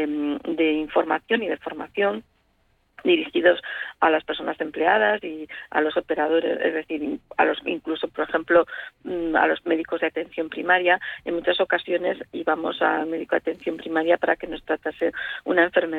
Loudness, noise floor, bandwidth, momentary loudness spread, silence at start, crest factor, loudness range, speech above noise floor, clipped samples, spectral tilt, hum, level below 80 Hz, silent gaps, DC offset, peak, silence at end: -23 LUFS; -65 dBFS; 4.5 kHz; 9 LU; 0 s; 18 dB; 2 LU; 42 dB; under 0.1%; -6.5 dB/octave; none; -60 dBFS; none; under 0.1%; -6 dBFS; 0 s